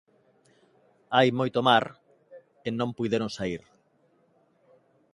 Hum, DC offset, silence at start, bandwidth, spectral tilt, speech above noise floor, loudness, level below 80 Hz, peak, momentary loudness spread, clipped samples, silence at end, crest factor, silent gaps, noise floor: none; under 0.1%; 1.1 s; 11.5 kHz; -5.5 dB/octave; 41 dB; -26 LUFS; -64 dBFS; -6 dBFS; 15 LU; under 0.1%; 1.55 s; 24 dB; none; -66 dBFS